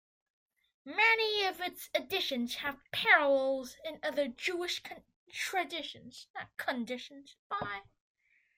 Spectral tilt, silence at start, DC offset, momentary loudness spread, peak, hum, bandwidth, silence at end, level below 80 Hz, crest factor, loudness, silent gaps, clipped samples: -2 dB/octave; 0.85 s; under 0.1%; 19 LU; -12 dBFS; none; 16 kHz; 0.75 s; -74 dBFS; 24 dB; -32 LUFS; 5.16-5.27 s, 6.30-6.34 s, 7.39-7.50 s; under 0.1%